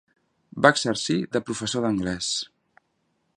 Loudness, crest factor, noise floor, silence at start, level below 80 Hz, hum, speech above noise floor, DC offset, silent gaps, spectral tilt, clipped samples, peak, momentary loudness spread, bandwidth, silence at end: -24 LUFS; 26 dB; -72 dBFS; 0.55 s; -56 dBFS; none; 48 dB; under 0.1%; none; -3.5 dB/octave; under 0.1%; 0 dBFS; 10 LU; 11.5 kHz; 0.9 s